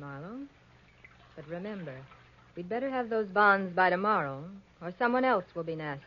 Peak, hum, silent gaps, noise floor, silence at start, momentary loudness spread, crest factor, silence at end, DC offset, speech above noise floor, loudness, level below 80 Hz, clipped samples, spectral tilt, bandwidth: -10 dBFS; none; none; -60 dBFS; 0 s; 21 LU; 22 dB; 0 s; under 0.1%; 29 dB; -29 LUFS; -68 dBFS; under 0.1%; -4 dB/octave; 7 kHz